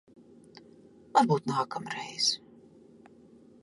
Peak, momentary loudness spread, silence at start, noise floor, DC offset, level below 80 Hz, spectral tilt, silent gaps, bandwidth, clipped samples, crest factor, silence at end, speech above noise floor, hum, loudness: -10 dBFS; 12 LU; 1.15 s; -56 dBFS; under 0.1%; -76 dBFS; -4 dB/octave; none; 11.5 kHz; under 0.1%; 24 dB; 1.25 s; 27 dB; none; -29 LUFS